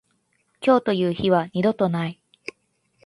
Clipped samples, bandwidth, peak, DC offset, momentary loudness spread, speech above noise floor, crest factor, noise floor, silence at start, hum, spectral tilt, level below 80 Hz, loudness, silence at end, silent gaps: under 0.1%; 11.5 kHz; -4 dBFS; under 0.1%; 19 LU; 48 dB; 18 dB; -68 dBFS; 0.6 s; none; -7.5 dB/octave; -60 dBFS; -22 LUFS; 0.9 s; none